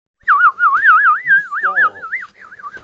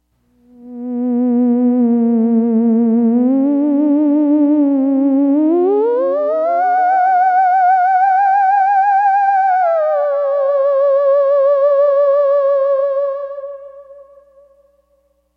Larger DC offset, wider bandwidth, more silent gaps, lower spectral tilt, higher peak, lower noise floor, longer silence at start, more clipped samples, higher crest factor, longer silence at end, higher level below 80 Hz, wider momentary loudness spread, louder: neither; first, 7.4 kHz vs 4.9 kHz; neither; second, -2.5 dB/octave vs -9 dB/octave; first, 0 dBFS vs -6 dBFS; second, -34 dBFS vs -60 dBFS; second, 0.25 s vs 0.6 s; neither; first, 14 dB vs 8 dB; second, 0.05 s vs 1.35 s; about the same, -66 dBFS vs -66 dBFS; first, 15 LU vs 4 LU; about the same, -11 LUFS vs -13 LUFS